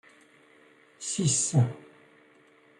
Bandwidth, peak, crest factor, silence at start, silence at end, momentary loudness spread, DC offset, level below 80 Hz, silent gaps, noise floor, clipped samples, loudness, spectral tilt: 11.5 kHz; -12 dBFS; 20 dB; 1 s; 1 s; 15 LU; under 0.1%; -68 dBFS; none; -59 dBFS; under 0.1%; -27 LUFS; -4.5 dB/octave